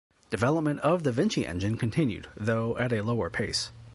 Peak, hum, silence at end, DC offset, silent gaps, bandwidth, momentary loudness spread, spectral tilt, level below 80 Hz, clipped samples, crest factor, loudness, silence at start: -10 dBFS; none; 0 s; under 0.1%; none; 11.5 kHz; 5 LU; -6 dB/octave; -52 dBFS; under 0.1%; 18 dB; -28 LUFS; 0.3 s